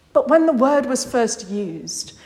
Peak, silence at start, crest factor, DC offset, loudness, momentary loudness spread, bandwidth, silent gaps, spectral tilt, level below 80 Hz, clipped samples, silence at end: -2 dBFS; 0.15 s; 18 dB; under 0.1%; -19 LUFS; 12 LU; 16 kHz; none; -4 dB/octave; -58 dBFS; under 0.1%; 0.15 s